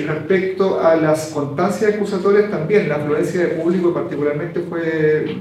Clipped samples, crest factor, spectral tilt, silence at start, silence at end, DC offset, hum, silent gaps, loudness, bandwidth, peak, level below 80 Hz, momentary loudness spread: under 0.1%; 14 dB; -7 dB/octave; 0 s; 0 s; under 0.1%; none; none; -18 LUFS; 14 kHz; -4 dBFS; -60 dBFS; 6 LU